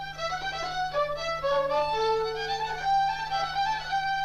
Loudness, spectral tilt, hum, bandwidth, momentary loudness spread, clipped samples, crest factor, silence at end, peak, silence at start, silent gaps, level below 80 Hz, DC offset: -28 LUFS; -2.5 dB/octave; none; 14 kHz; 5 LU; under 0.1%; 12 dB; 0 s; -16 dBFS; 0 s; none; -50 dBFS; under 0.1%